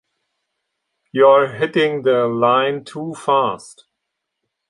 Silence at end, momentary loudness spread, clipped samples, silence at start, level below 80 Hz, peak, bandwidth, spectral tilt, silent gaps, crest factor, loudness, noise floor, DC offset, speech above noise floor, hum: 1 s; 14 LU; under 0.1%; 1.15 s; -66 dBFS; -2 dBFS; 11.5 kHz; -5.5 dB/octave; none; 18 dB; -17 LUFS; -78 dBFS; under 0.1%; 62 dB; none